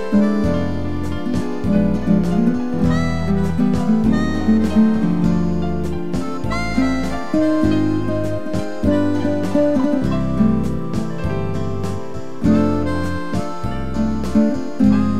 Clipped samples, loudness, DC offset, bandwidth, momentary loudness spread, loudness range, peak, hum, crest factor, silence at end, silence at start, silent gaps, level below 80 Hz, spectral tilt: under 0.1%; -19 LUFS; 6%; 12 kHz; 8 LU; 3 LU; -4 dBFS; none; 14 dB; 0 s; 0 s; none; -32 dBFS; -8 dB/octave